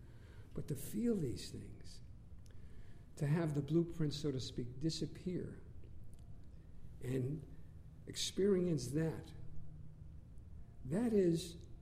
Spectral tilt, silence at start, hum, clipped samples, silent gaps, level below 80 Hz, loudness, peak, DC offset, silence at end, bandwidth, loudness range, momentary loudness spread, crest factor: -6 dB/octave; 0 s; none; under 0.1%; none; -58 dBFS; -39 LUFS; -22 dBFS; under 0.1%; 0 s; 15.5 kHz; 5 LU; 23 LU; 18 dB